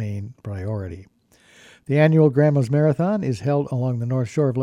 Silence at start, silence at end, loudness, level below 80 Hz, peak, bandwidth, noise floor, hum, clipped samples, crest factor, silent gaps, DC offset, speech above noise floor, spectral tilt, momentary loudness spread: 0 s; 0 s; -20 LUFS; -56 dBFS; -4 dBFS; 10 kHz; -53 dBFS; none; under 0.1%; 16 dB; none; under 0.1%; 33 dB; -9 dB/octave; 16 LU